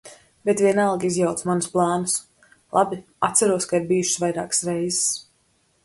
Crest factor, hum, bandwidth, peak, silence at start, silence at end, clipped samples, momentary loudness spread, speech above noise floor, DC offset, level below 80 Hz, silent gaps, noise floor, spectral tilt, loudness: 18 dB; none; 12 kHz; -4 dBFS; 0.05 s; 0.65 s; under 0.1%; 6 LU; 43 dB; under 0.1%; -62 dBFS; none; -64 dBFS; -4 dB/octave; -22 LUFS